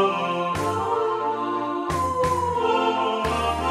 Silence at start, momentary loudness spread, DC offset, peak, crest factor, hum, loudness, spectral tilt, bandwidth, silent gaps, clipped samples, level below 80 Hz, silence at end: 0 s; 4 LU; under 0.1%; -10 dBFS; 14 dB; none; -24 LUFS; -5 dB/octave; 15 kHz; none; under 0.1%; -44 dBFS; 0 s